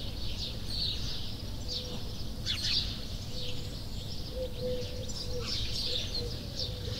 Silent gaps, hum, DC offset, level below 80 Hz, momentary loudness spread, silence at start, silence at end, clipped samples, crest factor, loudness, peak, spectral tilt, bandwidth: none; none; under 0.1%; -42 dBFS; 9 LU; 0 s; 0 s; under 0.1%; 18 dB; -35 LUFS; -18 dBFS; -4 dB/octave; 16 kHz